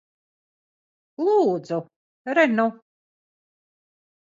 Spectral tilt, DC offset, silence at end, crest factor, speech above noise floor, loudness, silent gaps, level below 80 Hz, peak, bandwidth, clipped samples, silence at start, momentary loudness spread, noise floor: -6.5 dB/octave; under 0.1%; 1.6 s; 20 dB; over 69 dB; -22 LUFS; 1.96-2.25 s; -80 dBFS; -6 dBFS; 7.6 kHz; under 0.1%; 1.2 s; 11 LU; under -90 dBFS